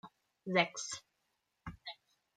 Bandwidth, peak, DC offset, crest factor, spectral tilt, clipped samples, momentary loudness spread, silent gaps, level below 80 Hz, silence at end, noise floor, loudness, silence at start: 10 kHz; -14 dBFS; under 0.1%; 26 dB; -3 dB/octave; under 0.1%; 20 LU; none; -68 dBFS; 0.45 s; -83 dBFS; -36 LUFS; 0.05 s